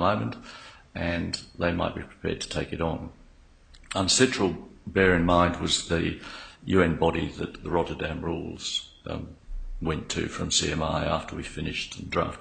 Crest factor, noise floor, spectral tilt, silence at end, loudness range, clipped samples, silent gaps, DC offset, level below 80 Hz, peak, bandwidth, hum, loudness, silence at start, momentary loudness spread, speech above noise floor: 22 dB; -54 dBFS; -4 dB/octave; 0 s; 7 LU; under 0.1%; none; under 0.1%; -42 dBFS; -6 dBFS; 9.6 kHz; none; -27 LUFS; 0 s; 16 LU; 27 dB